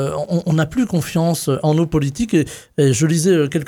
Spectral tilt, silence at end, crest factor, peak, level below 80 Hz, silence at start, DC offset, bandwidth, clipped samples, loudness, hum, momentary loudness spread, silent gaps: -6 dB/octave; 0 s; 14 dB; -4 dBFS; -44 dBFS; 0 s; under 0.1%; 17.5 kHz; under 0.1%; -18 LUFS; none; 4 LU; none